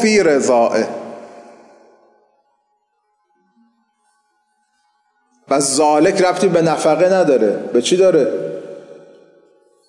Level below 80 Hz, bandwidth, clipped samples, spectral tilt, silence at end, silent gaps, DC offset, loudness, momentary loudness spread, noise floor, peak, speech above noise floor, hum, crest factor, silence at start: -64 dBFS; 11.5 kHz; under 0.1%; -4 dB/octave; 0.95 s; none; under 0.1%; -14 LUFS; 18 LU; -66 dBFS; -4 dBFS; 53 dB; none; 14 dB; 0 s